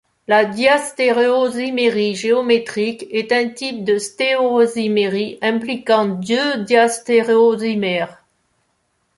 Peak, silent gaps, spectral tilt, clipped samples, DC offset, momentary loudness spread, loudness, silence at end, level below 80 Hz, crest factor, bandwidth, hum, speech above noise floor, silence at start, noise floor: -2 dBFS; none; -4 dB/octave; under 0.1%; under 0.1%; 7 LU; -17 LUFS; 1.05 s; -64 dBFS; 16 dB; 11.5 kHz; none; 50 dB; 0.3 s; -66 dBFS